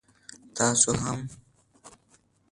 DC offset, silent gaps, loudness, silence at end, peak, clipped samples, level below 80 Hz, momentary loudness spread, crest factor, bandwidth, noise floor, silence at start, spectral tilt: under 0.1%; none; -24 LUFS; 0.6 s; -6 dBFS; under 0.1%; -56 dBFS; 19 LU; 24 dB; 11.5 kHz; -64 dBFS; 0.3 s; -3 dB/octave